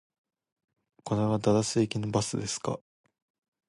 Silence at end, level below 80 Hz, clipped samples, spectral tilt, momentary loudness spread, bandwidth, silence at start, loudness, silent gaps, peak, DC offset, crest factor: 0.9 s; -60 dBFS; under 0.1%; -5.5 dB/octave; 10 LU; 11.5 kHz; 1.05 s; -29 LUFS; none; -12 dBFS; under 0.1%; 18 dB